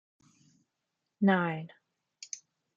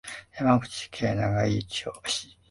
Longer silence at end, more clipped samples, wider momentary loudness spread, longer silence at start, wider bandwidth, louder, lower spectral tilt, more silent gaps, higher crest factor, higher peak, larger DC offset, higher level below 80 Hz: first, 0.4 s vs 0.25 s; neither; first, 22 LU vs 9 LU; first, 1.2 s vs 0.05 s; second, 7.6 kHz vs 11.5 kHz; about the same, -29 LUFS vs -27 LUFS; about the same, -6 dB/octave vs -5 dB/octave; neither; about the same, 22 dB vs 22 dB; second, -14 dBFS vs -6 dBFS; neither; second, -82 dBFS vs -52 dBFS